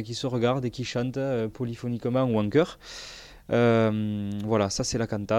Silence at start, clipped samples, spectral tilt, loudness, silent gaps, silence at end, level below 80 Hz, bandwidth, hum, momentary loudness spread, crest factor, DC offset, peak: 0 s; under 0.1%; -6 dB/octave; -26 LUFS; none; 0 s; -54 dBFS; 13.5 kHz; none; 11 LU; 16 dB; under 0.1%; -10 dBFS